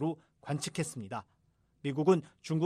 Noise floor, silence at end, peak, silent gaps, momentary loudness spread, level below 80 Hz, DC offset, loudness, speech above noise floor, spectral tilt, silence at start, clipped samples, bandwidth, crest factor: -58 dBFS; 0 s; -14 dBFS; none; 14 LU; -72 dBFS; under 0.1%; -34 LUFS; 25 dB; -6 dB/octave; 0 s; under 0.1%; 13.5 kHz; 20 dB